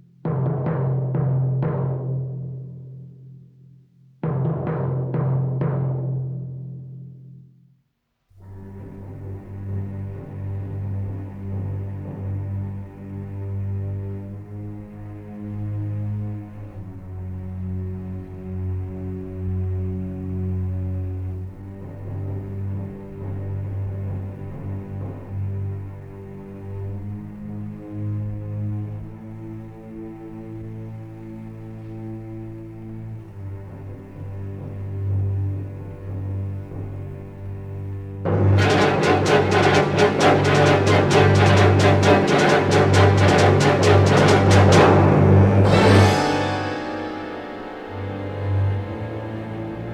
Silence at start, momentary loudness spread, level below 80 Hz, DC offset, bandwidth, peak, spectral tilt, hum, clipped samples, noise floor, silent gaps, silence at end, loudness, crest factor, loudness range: 0.25 s; 21 LU; -46 dBFS; under 0.1%; 11 kHz; -2 dBFS; -6.5 dB/octave; none; under 0.1%; -71 dBFS; none; 0 s; -21 LUFS; 18 dB; 19 LU